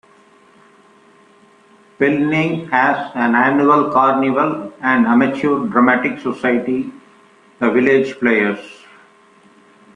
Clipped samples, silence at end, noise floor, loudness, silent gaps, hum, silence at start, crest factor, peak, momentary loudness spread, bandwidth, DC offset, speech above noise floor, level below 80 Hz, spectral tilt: under 0.1%; 1.2 s; -49 dBFS; -15 LUFS; none; none; 2 s; 16 dB; 0 dBFS; 8 LU; 9.2 kHz; under 0.1%; 34 dB; -60 dBFS; -7 dB/octave